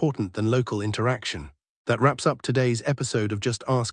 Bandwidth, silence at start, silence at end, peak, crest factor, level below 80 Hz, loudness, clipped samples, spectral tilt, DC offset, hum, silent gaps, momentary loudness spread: 10.5 kHz; 0 s; 0 s; -6 dBFS; 18 dB; -56 dBFS; -25 LUFS; under 0.1%; -5.5 dB/octave; under 0.1%; none; 1.69-1.85 s; 6 LU